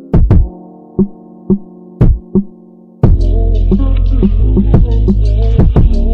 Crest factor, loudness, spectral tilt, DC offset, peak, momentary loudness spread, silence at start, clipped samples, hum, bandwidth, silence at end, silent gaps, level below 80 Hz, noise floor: 10 dB; -13 LUFS; -11 dB/octave; under 0.1%; 0 dBFS; 6 LU; 0 s; under 0.1%; none; 4.7 kHz; 0 s; none; -12 dBFS; -38 dBFS